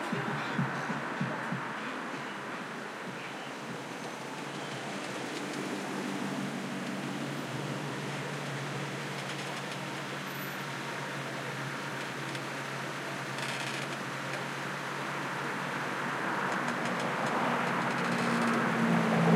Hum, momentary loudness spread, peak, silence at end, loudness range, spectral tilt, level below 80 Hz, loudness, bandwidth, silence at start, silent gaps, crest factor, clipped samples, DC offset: none; 9 LU; -12 dBFS; 0 s; 7 LU; -5 dB/octave; -78 dBFS; -34 LUFS; 16.5 kHz; 0 s; none; 22 dB; under 0.1%; under 0.1%